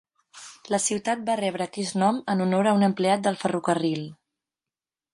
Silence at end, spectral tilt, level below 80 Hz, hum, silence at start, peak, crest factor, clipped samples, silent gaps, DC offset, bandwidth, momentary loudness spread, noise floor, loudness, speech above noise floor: 1 s; -5 dB/octave; -70 dBFS; none; 0.35 s; -8 dBFS; 16 dB; under 0.1%; none; under 0.1%; 11.5 kHz; 12 LU; under -90 dBFS; -25 LUFS; over 66 dB